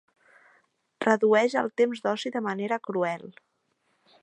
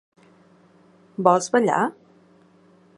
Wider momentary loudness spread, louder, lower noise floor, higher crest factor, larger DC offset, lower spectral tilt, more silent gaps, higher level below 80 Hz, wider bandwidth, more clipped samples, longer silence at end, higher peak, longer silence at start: about the same, 9 LU vs 9 LU; second, -26 LUFS vs -21 LUFS; first, -73 dBFS vs -55 dBFS; about the same, 22 dB vs 24 dB; neither; about the same, -5 dB/octave vs -5 dB/octave; neither; second, -82 dBFS vs -76 dBFS; second, 10 kHz vs 11.5 kHz; neither; about the same, 0.95 s vs 1.05 s; second, -6 dBFS vs -2 dBFS; second, 1 s vs 1.2 s